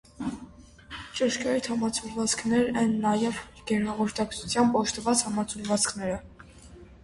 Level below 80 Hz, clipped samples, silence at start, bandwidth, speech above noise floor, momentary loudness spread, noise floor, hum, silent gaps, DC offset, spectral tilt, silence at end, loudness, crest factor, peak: -54 dBFS; under 0.1%; 0.2 s; 11.5 kHz; 22 dB; 12 LU; -49 dBFS; none; none; under 0.1%; -3.5 dB/octave; 0.05 s; -27 LUFS; 18 dB; -10 dBFS